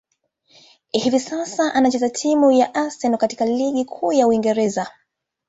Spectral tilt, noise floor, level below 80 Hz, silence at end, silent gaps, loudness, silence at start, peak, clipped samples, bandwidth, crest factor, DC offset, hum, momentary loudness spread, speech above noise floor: -4 dB/octave; -63 dBFS; -62 dBFS; 0.6 s; none; -19 LUFS; 0.95 s; -4 dBFS; under 0.1%; 8 kHz; 16 dB; under 0.1%; none; 7 LU; 44 dB